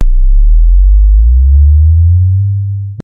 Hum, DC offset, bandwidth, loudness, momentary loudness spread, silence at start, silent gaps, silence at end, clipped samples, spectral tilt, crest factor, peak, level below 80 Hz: none; under 0.1%; 0.4 kHz; -9 LUFS; 6 LU; 0 s; none; 0 s; under 0.1%; -10.5 dB/octave; 6 dB; 0 dBFS; -6 dBFS